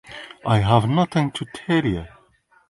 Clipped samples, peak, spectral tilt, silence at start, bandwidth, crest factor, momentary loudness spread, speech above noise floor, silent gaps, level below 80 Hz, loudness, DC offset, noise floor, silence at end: under 0.1%; 0 dBFS; -7 dB/octave; 0.1 s; 11.5 kHz; 20 dB; 14 LU; 39 dB; none; -44 dBFS; -21 LUFS; under 0.1%; -59 dBFS; 0.65 s